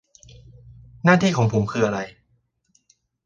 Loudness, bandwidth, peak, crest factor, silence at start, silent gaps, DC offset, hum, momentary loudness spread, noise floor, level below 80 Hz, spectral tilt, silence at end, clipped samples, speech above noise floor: -20 LUFS; 7.6 kHz; -2 dBFS; 22 dB; 1.05 s; none; under 0.1%; none; 11 LU; -67 dBFS; -52 dBFS; -6.5 dB/octave; 1.15 s; under 0.1%; 48 dB